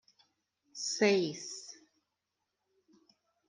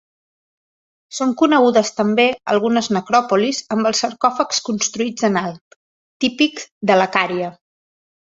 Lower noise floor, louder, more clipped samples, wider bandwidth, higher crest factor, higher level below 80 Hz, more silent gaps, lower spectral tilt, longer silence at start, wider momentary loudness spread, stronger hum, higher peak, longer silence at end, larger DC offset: second, -86 dBFS vs under -90 dBFS; second, -32 LUFS vs -17 LUFS; neither; first, 10 kHz vs 8 kHz; first, 24 dB vs 18 dB; second, -88 dBFS vs -62 dBFS; second, none vs 5.61-6.20 s, 6.71-6.81 s; about the same, -3.5 dB/octave vs -3.5 dB/octave; second, 0.75 s vs 1.1 s; first, 21 LU vs 7 LU; neither; second, -14 dBFS vs -2 dBFS; first, 1.75 s vs 0.85 s; neither